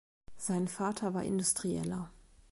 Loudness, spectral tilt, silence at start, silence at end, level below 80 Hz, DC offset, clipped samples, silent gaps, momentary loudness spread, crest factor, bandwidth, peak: -34 LUFS; -4.5 dB/octave; 0.3 s; 0.4 s; -62 dBFS; under 0.1%; under 0.1%; none; 10 LU; 18 dB; 12 kHz; -18 dBFS